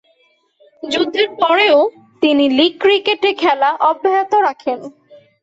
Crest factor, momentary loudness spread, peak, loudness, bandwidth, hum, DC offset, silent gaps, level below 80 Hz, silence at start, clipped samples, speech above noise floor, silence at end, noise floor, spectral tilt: 14 dB; 9 LU; -2 dBFS; -14 LUFS; 8 kHz; none; under 0.1%; none; -64 dBFS; 0.85 s; under 0.1%; 44 dB; 0.5 s; -58 dBFS; -3.5 dB/octave